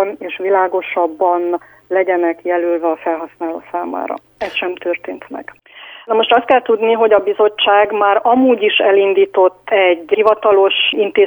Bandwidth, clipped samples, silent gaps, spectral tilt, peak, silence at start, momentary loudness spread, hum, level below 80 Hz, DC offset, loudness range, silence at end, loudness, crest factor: over 20 kHz; under 0.1%; none; -5.5 dB/octave; 0 dBFS; 0 s; 12 LU; none; -60 dBFS; under 0.1%; 8 LU; 0 s; -14 LUFS; 14 dB